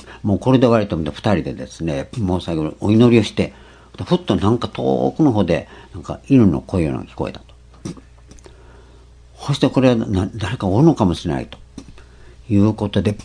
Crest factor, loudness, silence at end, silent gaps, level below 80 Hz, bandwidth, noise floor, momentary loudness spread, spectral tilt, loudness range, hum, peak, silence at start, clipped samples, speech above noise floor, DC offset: 18 dB; -18 LUFS; 0 s; none; -42 dBFS; 10.5 kHz; -44 dBFS; 17 LU; -7.5 dB/octave; 5 LU; none; 0 dBFS; 0.05 s; under 0.1%; 27 dB; under 0.1%